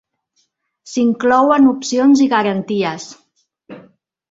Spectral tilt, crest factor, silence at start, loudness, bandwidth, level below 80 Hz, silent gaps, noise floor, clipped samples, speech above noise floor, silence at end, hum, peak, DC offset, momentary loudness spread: -5 dB/octave; 16 dB; 0.85 s; -14 LUFS; 7.8 kHz; -60 dBFS; none; -65 dBFS; under 0.1%; 51 dB; 0.5 s; none; -2 dBFS; under 0.1%; 12 LU